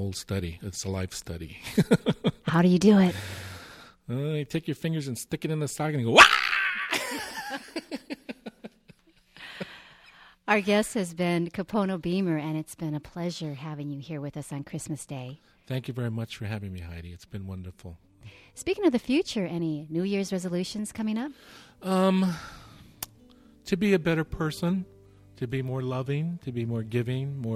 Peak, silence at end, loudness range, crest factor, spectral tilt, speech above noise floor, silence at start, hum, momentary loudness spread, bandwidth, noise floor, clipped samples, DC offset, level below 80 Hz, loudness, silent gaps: -2 dBFS; 0 s; 13 LU; 26 dB; -5 dB/octave; 31 dB; 0 s; none; 17 LU; 16 kHz; -58 dBFS; under 0.1%; under 0.1%; -54 dBFS; -27 LUFS; none